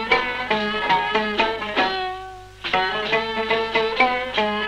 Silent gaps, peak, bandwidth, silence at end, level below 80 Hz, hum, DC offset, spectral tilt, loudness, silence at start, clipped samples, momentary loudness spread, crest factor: none; -6 dBFS; 12.5 kHz; 0 s; -48 dBFS; none; under 0.1%; -4 dB/octave; -21 LUFS; 0 s; under 0.1%; 7 LU; 16 dB